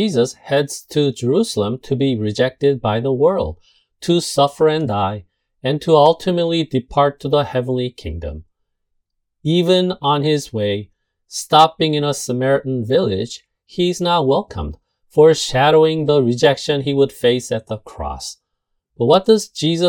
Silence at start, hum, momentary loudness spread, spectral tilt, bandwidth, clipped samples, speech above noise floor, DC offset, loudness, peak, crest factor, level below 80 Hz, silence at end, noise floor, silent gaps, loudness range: 0 s; none; 15 LU; -5.5 dB/octave; 18 kHz; under 0.1%; 57 dB; under 0.1%; -17 LUFS; 0 dBFS; 18 dB; -44 dBFS; 0 s; -73 dBFS; none; 5 LU